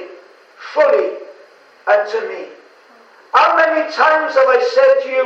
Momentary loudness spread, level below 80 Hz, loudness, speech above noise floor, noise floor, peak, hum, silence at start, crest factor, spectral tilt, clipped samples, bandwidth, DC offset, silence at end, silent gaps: 16 LU; -70 dBFS; -14 LUFS; 33 dB; -46 dBFS; 0 dBFS; none; 0 s; 16 dB; -2 dB/octave; under 0.1%; 7.4 kHz; under 0.1%; 0 s; none